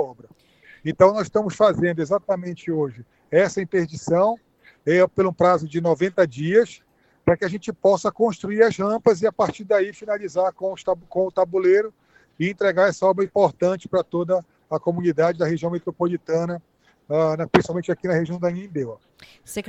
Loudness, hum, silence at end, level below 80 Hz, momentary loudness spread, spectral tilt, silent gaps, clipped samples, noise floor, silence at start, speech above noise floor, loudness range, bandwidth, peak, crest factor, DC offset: -21 LUFS; none; 0 s; -58 dBFS; 9 LU; -6.5 dB/octave; none; under 0.1%; -52 dBFS; 0 s; 31 dB; 3 LU; 13 kHz; 0 dBFS; 22 dB; under 0.1%